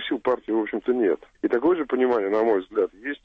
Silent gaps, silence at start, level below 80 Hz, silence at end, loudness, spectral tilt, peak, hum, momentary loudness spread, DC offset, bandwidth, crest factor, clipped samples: none; 0 s; -62 dBFS; 0.1 s; -24 LUFS; -7 dB/octave; -10 dBFS; none; 5 LU; under 0.1%; 5.2 kHz; 12 dB; under 0.1%